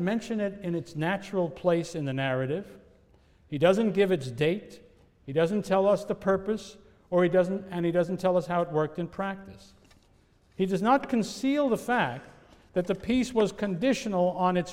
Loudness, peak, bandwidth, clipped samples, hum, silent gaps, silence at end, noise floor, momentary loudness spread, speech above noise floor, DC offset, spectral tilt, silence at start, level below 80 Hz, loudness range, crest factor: -28 LUFS; -10 dBFS; 15.5 kHz; under 0.1%; none; none; 0 s; -62 dBFS; 9 LU; 35 dB; under 0.1%; -6.5 dB/octave; 0 s; -58 dBFS; 3 LU; 18 dB